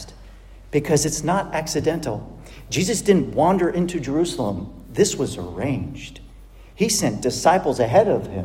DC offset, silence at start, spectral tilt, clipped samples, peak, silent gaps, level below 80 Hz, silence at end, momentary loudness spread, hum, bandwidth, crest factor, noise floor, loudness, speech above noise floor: under 0.1%; 0 s; -4.5 dB/octave; under 0.1%; -2 dBFS; none; -44 dBFS; 0 s; 14 LU; none; 16.5 kHz; 20 dB; -43 dBFS; -21 LUFS; 23 dB